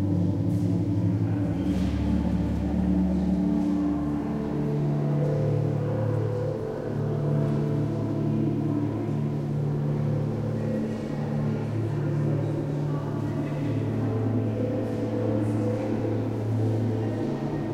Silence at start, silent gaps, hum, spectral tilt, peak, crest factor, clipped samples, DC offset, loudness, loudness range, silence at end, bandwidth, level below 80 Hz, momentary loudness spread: 0 s; none; none; -9.5 dB/octave; -14 dBFS; 12 dB; under 0.1%; under 0.1%; -27 LUFS; 2 LU; 0 s; 9.6 kHz; -42 dBFS; 4 LU